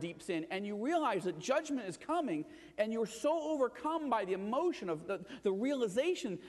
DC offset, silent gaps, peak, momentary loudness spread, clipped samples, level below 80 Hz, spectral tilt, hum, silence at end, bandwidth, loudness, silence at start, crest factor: under 0.1%; none; -20 dBFS; 6 LU; under 0.1%; -74 dBFS; -5 dB/octave; none; 0 s; 12 kHz; -36 LUFS; 0 s; 16 dB